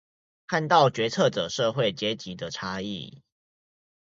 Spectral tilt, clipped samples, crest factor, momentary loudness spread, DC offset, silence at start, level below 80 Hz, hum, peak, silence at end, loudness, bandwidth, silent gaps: -4.5 dB/octave; under 0.1%; 22 dB; 14 LU; under 0.1%; 0.5 s; -62 dBFS; none; -4 dBFS; 0.95 s; -26 LUFS; 7.8 kHz; none